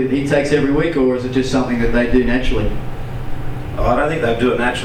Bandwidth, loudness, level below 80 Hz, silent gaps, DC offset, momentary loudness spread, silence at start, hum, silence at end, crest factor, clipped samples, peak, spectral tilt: 10.5 kHz; -17 LUFS; -26 dBFS; none; under 0.1%; 12 LU; 0 s; none; 0 s; 14 dB; under 0.1%; -2 dBFS; -6.5 dB/octave